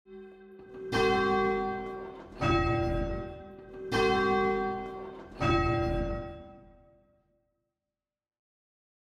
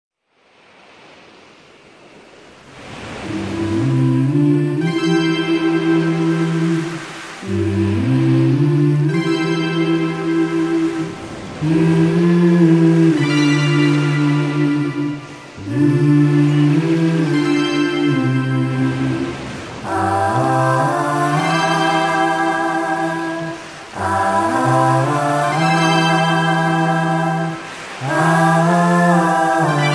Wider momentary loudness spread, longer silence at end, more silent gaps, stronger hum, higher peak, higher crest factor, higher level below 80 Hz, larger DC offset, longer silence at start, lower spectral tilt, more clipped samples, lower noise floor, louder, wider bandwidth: first, 20 LU vs 11 LU; first, 2.4 s vs 0 s; neither; neither; second, -14 dBFS vs -2 dBFS; about the same, 18 dB vs 14 dB; first, -44 dBFS vs -54 dBFS; neither; second, 0.1 s vs 2.65 s; about the same, -6.5 dB/octave vs -6.5 dB/octave; neither; first, under -90 dBFS vs -55 dBFS; second, -29 LUFS vs -16 LUFS; about the same, 12 kHz vs 11 kHz